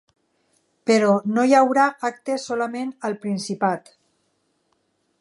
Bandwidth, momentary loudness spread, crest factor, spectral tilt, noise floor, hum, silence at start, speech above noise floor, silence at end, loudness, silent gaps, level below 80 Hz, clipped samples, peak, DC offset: 11.5 kHz; 12 LU; 18 dB; -5 dB/octave; -69 dBFS; none; 0.85 s; 49 dB; 1.4 s; -21 LUFS; none; -76 dBFS; under 0.1%; -4 dBFS; under 0.1%